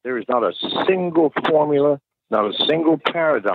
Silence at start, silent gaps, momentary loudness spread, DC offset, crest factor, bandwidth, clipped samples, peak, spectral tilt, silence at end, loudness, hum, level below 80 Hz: 0.05 s; none; 5 LU; under 0.1%; 14 dB; 5.2 kHz; under 0.1%; -6 dBFS; -7.5 dB/octave; 0 s; -19 LUFS; none; -66 dBFS